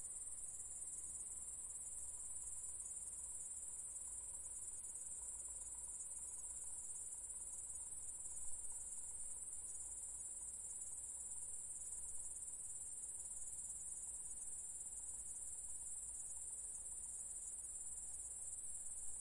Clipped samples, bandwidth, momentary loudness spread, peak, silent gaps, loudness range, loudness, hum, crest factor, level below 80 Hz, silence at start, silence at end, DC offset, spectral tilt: under 0.1%; 11.5 kHz; 1 LU; -34 dBFS; none; 0 LU; -47 LUFS; none; 16 dB; -70 dBFS; 0 s; 0 s; under 0.1%; -1 dB/octave